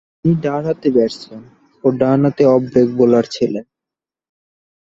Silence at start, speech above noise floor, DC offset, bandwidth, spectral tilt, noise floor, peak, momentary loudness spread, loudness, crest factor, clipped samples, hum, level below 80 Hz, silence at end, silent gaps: 0.25 s; 72 dB; under 0.1%; 7.8 kHz; -8 dB/octave; -87 dBFS; -2 dBFS; 8 LU; -15 LUFS; 16 dB; under 0.1%; none; -52 dBFS; 1.25 s; none